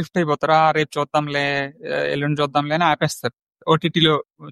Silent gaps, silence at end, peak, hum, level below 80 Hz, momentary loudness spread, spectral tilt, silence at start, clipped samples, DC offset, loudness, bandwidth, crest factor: 3.33-3.47 s, 4.30-4.34 s; 0 s; -2 dBFS; none; -58 dBFS; 8 LU; -5 dB/octave; 0 s; under 0.1%; under 0.1%; -20 LUFS; 13.5 kHz; 18 dB